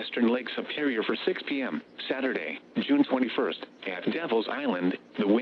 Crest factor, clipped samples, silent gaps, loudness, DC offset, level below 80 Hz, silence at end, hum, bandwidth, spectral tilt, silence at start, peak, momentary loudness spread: 18 dB; under 0.1%; none; -29 LUFS; under 0.1%; -82 dBFS; 0 s; none; 5.8 kHz; -7.5 dB/octave; 0 s; -10 dBFS; 8 LU